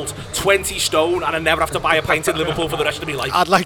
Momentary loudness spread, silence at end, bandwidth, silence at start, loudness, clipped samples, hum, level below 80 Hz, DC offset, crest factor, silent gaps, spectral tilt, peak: 5 LU; 0 s; over 20 kHz; 0 s; -18 LUFS; under 0.1%; none; -40 dBFS; under 0.1%; 18 dB; none; -3 dB/octave; 0 dBFS